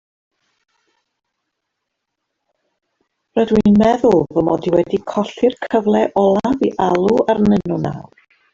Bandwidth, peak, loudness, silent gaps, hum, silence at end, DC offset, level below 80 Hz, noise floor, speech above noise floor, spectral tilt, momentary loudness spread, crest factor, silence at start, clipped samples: 7.4 kHz; -2 dBFS; -16 LUFS; none; none; 0.5 s; under 0.1%; -46 dBFS; -77 dBFS; 62 dB; -7.5 dB/octave; 9 LU; 16 dB; 3.35 s; under 0.1%